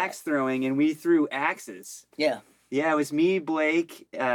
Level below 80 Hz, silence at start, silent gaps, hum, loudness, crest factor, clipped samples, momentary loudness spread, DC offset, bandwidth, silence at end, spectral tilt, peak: -80 dBFS; 0 s; none; none; -26 LUFS; 16 dB; under 0.1%; 13 LU; under 0.1%; 18.5 kHz; 0 s; -5 dB/octave; -10 dBFS